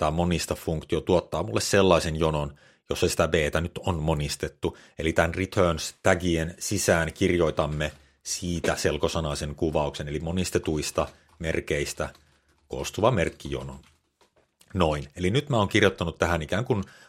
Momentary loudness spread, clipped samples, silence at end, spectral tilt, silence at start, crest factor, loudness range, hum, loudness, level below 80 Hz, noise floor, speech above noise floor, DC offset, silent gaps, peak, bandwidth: 10 LU; under 0.1%; 0.2 s; -5 dB/octave; 0 s; 24 dB; 5 LU; none; -26 LUFS; -44 dBFS; -65 dBFS; 39 dB; under 0.1%; none; -2 dBFS; 16 kHz